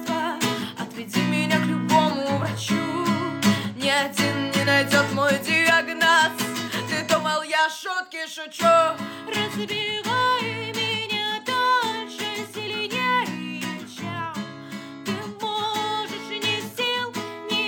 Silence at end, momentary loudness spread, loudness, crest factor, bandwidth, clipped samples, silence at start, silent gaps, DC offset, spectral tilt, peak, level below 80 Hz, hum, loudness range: 0 s; 12 LU; -23 LUFS; 18 dB; 18 kHz; under 0.1%; 0 s; none; under 0.1%; -3.5 dB/octave; -6 dBFS; -70 dBFS; none; 8 LU